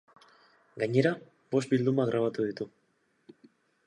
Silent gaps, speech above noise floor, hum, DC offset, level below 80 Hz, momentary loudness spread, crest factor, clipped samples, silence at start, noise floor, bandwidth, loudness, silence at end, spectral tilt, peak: none; 43 dB; none; under 0.1%; -76 dBFS; 14 LU; 20 dB; under 0.1%; 0.75 s; -71 dBFS; 11 kHz; -29 LUFS; 1.2 s; -7 dB/octave; -10 dBFS